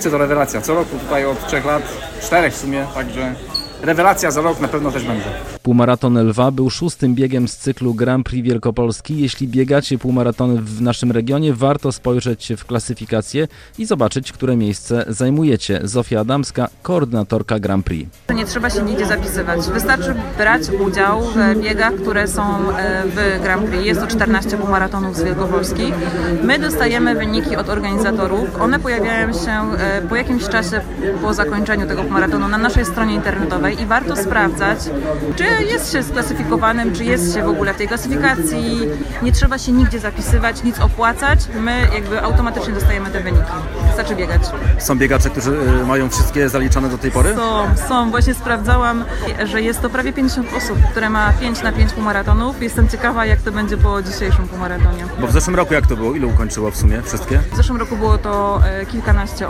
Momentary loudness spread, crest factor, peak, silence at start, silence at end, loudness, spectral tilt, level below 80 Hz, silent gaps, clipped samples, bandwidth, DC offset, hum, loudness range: 5 LU; 16 dB; 0 dBFS; 0 s; 0 s; -17 LUFS; -5.5 dB/octave; -22 dBFS; none; under 0.1%; 16.5 kHz; under 0.1%; none; 2 LU